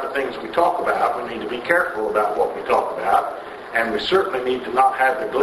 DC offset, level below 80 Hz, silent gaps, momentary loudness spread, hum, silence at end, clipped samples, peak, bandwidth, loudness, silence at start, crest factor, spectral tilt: under 0.1%; -56 dBFS; none; 7 LU; none; 0 s; under 0.1%; 0 dBFS; 12.5 kHz; -20 LUFS; 0 s; 20 dB; -4 dB/octave